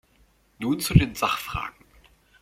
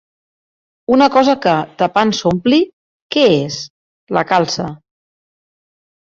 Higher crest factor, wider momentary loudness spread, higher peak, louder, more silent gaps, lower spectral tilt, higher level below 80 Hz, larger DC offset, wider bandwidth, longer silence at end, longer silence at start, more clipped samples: first, 24 dB vs 16 dB; about the same, 12 LU vs 13 LU; about the same, -2 dBFS vs 0 dBFS; second, -24 LUFS vs -15 LUFS; second, none vs 2.73-3.09 s, 3.70-4.07 s; about the same, -5.5 dB/octave vs -5 dB/octave; first, -38 dBFS vs -54 dBFS; neither; first, 16.5 kHz vs 7.6 kHz; second, 0.7 s vs 1.25 s; second, 0.6 s vs 0.9 s; neither